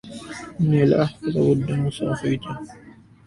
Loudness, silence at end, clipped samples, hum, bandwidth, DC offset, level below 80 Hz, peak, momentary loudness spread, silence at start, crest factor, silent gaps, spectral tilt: -21 LUFS; 0.35 s; under 0.1%; none; 11.5 kHz; under 0.1%; -50 dBFS; -6 dBFS; 17 LU; 0.05 s; 16 dB; none; -8 dB/octave